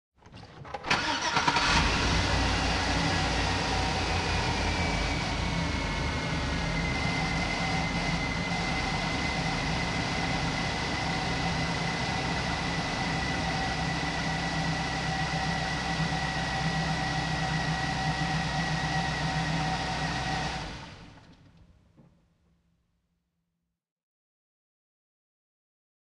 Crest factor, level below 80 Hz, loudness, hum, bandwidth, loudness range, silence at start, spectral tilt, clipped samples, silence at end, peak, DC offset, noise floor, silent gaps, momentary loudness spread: 20 dB; -40 dBFS; -29 LUFS; none; 11.5 kHz; 5 LU; 0.25 s; -4 dB/octave; under 0.1%; 4.4 s; -10 dBFS; under 0.1%; -83 dBFS; none; 4 LU